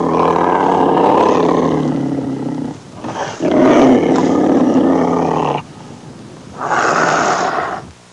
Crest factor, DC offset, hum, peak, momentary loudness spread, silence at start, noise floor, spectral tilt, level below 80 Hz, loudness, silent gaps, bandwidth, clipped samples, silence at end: 12 dB; under 0.1%; none; -2 dBFS; 17 LU; 0 s; -34 dBFS; -6 dB/octave; -50 dBFS; -14 LUFS; none; 10.5 kHz; under 0.1%; 0.2 s